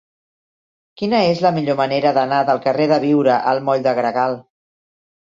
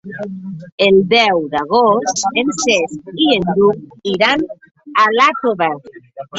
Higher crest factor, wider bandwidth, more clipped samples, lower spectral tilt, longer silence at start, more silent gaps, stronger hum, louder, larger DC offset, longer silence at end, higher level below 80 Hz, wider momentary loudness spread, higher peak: about the same, 16 dB vs 14 dB; about the same, 7.6 kHz vs 8 kHz; neither; first, -7 dB/octave vs -3.5 dB/octave; first, 1 s vs 0.05 s; second, none vs 0.72-0.78 s; neither; second, -17 LUFS vs -14 LUFS; neither; first, 0.9 s vs 0 s; second, -62 dBFS vs -54 dBFS; second, 5 LU vs 15 LU; about the same, -2 dBFS vs 0 dBFS